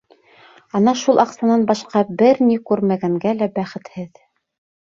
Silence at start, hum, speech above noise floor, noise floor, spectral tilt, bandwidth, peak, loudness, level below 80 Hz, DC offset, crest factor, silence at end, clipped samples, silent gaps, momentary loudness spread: 0.75 s; none; 32 dB; -49 dBFS; -6.5 dB/octave; 7.4 kHz; 0 dBFS; -17 LUFS; -62 dBFS; under 0.1%; 18 dB; 0.8 s; under 0.1%; none; 15 LU